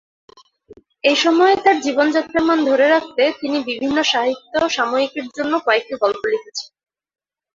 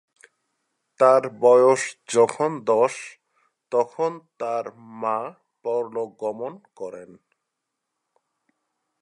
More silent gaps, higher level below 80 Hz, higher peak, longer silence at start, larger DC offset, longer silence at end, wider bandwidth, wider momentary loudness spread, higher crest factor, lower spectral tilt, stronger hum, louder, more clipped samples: neither; first, -58 dBFS vs -80 dBFS; about the same, -2 dBFS vs -4 dBFS; second, 0.7 s vs 1 s; neither; second, 0.9 s vs 1.95 s; second, 7.6 kHz vs 11 kHz; second, 9 LU vs 19 LU; about the same, 16 dB vs 20 dB; second, -2.5 dB/octave vs -4.5 dB/octave; neither; first, -17 LUFS vs -22 LUFS; neither